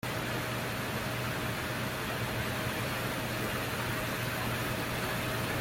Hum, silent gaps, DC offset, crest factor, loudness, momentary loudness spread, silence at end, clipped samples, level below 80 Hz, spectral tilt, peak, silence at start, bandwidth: none; none; under 0.1%; 14 dB; -33 LUFS; 1 LU; 0 s; under 0.1%; -52 dBFS; -4 dB/octave; -20 dBFS; 0.05 s; 17 kHz